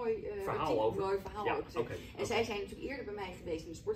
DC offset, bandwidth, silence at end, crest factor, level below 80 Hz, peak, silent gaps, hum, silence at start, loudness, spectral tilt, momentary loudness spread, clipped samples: under 0.1%; 16 kHz; 0 s; 16 dB; -56 dBFS; -22 dBFS; none; none; 0 s; -37 LUFS; -5 dB/octave; 9 LU; under 0.1%